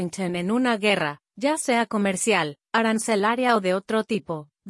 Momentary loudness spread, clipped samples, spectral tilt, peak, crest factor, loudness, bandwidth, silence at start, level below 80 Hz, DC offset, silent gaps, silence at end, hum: 7 LU; under 0.1%; -4 dB/octave; -6 dBFS; 16 dB; -23 LUFS; 12 kHz; 0 s; -68 dBFS; under 0.1%; none; 0 s; none